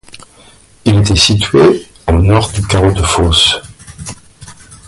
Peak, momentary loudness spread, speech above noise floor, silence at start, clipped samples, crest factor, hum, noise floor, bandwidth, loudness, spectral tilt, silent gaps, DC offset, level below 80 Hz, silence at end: 0 dBFS; 16 LU; 33 dB; 0.85 s; under 0.1%; 12 dB; none; -42 dBFS; 11.5 kHz; -10 LUFS; -4.5 dB/octave; none; under 0.1%; -24 dBFS; 0.15 s